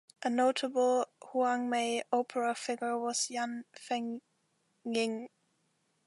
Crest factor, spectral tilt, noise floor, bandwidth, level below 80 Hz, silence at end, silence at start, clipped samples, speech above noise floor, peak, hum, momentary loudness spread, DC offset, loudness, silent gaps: 18 dB; -2.5 dB/octave; -76 dBFS; 11.5 kHz; -86 dBFS; 0.8 s; 0.2 s; under 0.1%; 44 dB; -16 dBFS; none; 12 LU; under 0.1%; -33 LUFS; none